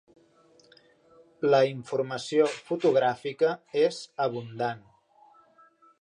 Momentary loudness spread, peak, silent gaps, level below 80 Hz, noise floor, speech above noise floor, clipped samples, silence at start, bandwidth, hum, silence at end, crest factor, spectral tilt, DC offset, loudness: 9 LU; -10 dBFS; none; -78 dBFS; -60 dBFS; 34 dB; under 0.1%; 1.4 s; 10.5 kHz; none; 1.2 s; 18 dB; -5.5 dB/octave; under 0.1%; -27 LUFS